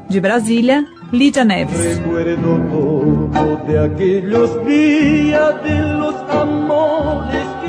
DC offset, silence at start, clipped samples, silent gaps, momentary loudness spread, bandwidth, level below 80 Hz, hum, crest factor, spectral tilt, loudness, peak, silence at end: under 0.1%; 0 s; under 0.1%; none; 6 LU; 11 kHz; -36 dBFS; none; 12 dB; -6 dB/octave; -15 LUFS; -2 dBFS; 0 s